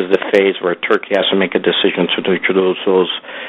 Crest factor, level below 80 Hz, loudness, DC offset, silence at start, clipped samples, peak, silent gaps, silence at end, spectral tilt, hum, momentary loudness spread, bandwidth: 14 dB; -62 dBFS; -15 LUFS; under 0.1%; 0 s; 0.1%; 0 dBFS; none; 0 s; -6.5 dB/octave; none; 3 LU; 6.8 kHz